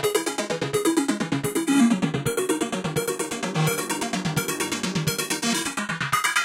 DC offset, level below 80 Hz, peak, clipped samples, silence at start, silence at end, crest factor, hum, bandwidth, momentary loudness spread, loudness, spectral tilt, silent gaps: under 0.1%; -56 dBFS; -8 dBFS; under 0.1%; 0 s; 0 s; 16 dB; none; 17 kHz; 6 LU; -24 LUFS; -4 dB/octave; none